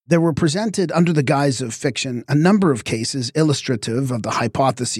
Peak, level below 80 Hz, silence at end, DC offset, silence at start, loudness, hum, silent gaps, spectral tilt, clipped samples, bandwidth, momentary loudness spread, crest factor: -4 dBFS; -54 dBFS; 0 s; under 0.1%; 0.1 s; -19 LUFS; none; none; -5.5 dB/octave; under 0.1%; 13.5 kHz; 6 LU; 16 dB